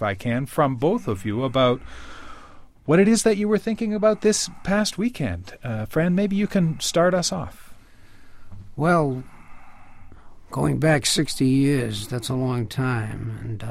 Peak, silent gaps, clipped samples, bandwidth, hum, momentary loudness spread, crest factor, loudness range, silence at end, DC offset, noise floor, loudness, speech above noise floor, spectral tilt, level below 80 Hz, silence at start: -6 dBFS; none; under 0.1%; 15.5 kHz; none; 13 LU; 16 dB; 4 LU; 0 s; under 0.1%; -45 dBFS; -22 LUFS; 23 dB; -5 dB/octave; -46 dBFS; 0 s